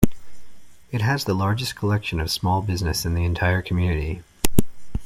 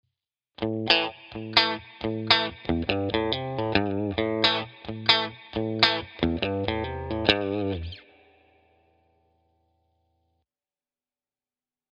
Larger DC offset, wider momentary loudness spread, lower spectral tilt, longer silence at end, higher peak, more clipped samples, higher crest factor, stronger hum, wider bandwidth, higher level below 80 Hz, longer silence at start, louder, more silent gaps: neither; second, 5 LU vs 11 LU; about the same, -5 dB/octave vs -5.5 dB/octave; second, 0 s vs 3.95 s; about the same, 0 dBFS vs 0 dBFS; neither; second, 22 dB vs 28 dB; neither; first, 16.5 kHz vs 8.6 kHz; first, -36 dBFS vs -48 dBFS; second, 0 s vs 0.6 s; about the same, -23 LUFS vs -25 LUFS; neither